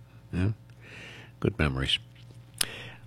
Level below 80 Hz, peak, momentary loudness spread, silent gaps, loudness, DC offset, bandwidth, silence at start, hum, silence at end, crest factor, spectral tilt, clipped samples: -44 dBFS; -2 dBFS; 20 LU; none; -30 LUFS; under 0.1%; 16.5 kHz; 0 s; 60 Hz at -50 dBFS; 0 s; 32 dB; -4 dB/octave; under 0.1%